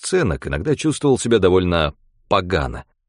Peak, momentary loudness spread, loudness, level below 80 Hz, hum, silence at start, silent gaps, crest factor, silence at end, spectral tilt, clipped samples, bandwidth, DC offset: -2 dBFS; 8 LU; -19 LUFS; -36 dBFS; none; 0 s; none; 18 dB; 0.25 s; -5.5 dB/octave; under 0.1%; 11 kHz; under 0.1%